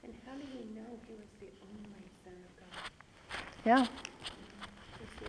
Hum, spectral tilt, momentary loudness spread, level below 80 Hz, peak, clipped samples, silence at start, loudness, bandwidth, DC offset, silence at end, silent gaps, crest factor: none; -4.5 dB/octave; 25 LU; -64 dBFS; -16 dBFS; under 0.1%; 0 s; -37 LUFS; 11 kHz; under 0.1%; 0 s; none; 24 dB